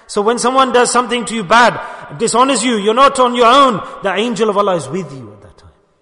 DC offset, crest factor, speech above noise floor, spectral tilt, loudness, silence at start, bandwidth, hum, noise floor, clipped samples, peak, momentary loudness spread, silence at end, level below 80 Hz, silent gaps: under 0.1%; 14 dB; 33 dB; -3 dB/octave; -12 LUFS; 0.1 s; 11 kHz; none; -46 dBFS; under 0.1%; 0 dBFS; 11 LU; 0.7 s; -50 dBFS; none